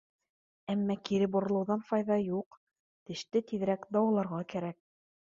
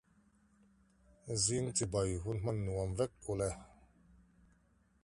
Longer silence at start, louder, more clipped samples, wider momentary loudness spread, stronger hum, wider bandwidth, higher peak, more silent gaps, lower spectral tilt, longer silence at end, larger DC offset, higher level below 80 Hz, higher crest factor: second, 0.7 s vs 1.25 s; first, -32 LUFS vs -37 LUFS; neither; first, 12 LU vs 7 LU; neither; second, 7.4 kHz vs 11.5 kHz; first, -16 dBFS vs -20 dBFS; first, 2.46-2.51 s, 2.57-2.67 s, 2.79-3.06 s vs none; first, -7 dB/octave vs -4.5 dB/octave; second, 0.65 s vs 1.35 s; neither; second, -74 dBFS vs -54 dBFS; about the same, 18 dB vs 20 dB